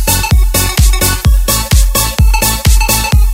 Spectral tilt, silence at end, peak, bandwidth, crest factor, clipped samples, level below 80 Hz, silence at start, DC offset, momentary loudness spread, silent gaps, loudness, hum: -3.5 dB/octave; 0 s; 0 dBFS; 16.5 kHz; 8 dB; 0.1%; -10 dBFS; 0 s; under 0.1%; 1 LU; none; -10 LUFS; none